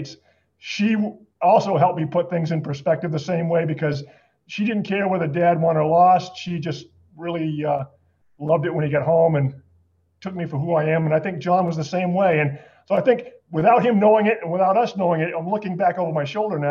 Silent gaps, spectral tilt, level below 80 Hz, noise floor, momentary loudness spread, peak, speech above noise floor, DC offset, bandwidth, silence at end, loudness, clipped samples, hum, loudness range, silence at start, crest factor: none; -7.5 dB/octave; -66 dBFS; -61 dBFS; 13 LU; -4 dBFS; 41 dB; under 0.1%; 7.2 kHz; 0 s; -21 LUFS; under 0.1%; none; 4 LU; 0 s; 16 dB